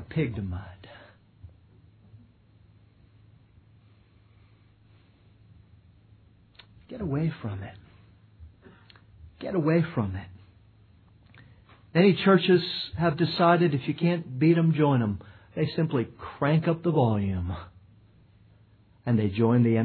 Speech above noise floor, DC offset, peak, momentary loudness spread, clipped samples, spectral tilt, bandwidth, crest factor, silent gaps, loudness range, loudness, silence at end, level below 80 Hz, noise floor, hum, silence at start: 34 dB; under 0.1%; -8 dBFS; 18 LU; under 0.1%; -10.5 dB/octave; 4.6 kHz; 20 dB; none; 14 LU; -25 LUFS; 0 s; -56 dBFS; -58 dBFS; none; 0 s